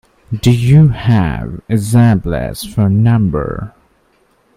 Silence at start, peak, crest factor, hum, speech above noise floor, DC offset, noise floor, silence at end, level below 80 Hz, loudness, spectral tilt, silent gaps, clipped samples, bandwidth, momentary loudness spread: 0.3 s; 0 dBFS; 12 dB; none; 43 dB; under 0.1%; -55 dBFS; 0.9 s; -32 dBFS; -13 LUFS; -7.5 dB/octave; none; under 0.1%; 15 kHz; 14 LU